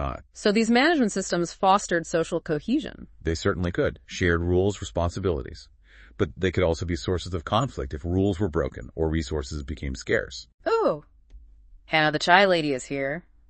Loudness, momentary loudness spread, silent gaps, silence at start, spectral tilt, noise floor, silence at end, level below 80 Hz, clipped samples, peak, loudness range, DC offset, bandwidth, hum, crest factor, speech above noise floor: -25 LUFS; 13 LU; 10.54-10.58 s; 0 s; -5 dB/octave; -50 dBFS; 0.3 s; -42 dBFS; under 0.1%; -2 dBFS; 4 LU; under 0.1%; 8.8 kHz; none; 24 dB; 26 dB